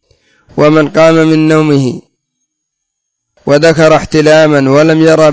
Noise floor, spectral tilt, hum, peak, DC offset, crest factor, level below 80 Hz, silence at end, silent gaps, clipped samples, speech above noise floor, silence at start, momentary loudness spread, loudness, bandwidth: -71 dBFS; -6 dB/octave; none; 0 dBFS; under 0.1%; 8 dB; -42 dBFS; 0 s; none; 2%; 65 dB; 0.55 s; 8 LU; -7 LUFS; 8 kHz